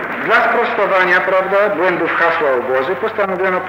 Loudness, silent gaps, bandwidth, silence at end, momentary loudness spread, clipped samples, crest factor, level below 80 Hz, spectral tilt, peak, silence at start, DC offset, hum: -14 LUFS; none; 16 kHz; 0 s; 5 LU; under 0.1%; 12 dB; -58 dBFS; -5.5 dB/octave; -2 dBFS; 0 s; under 0.1%; none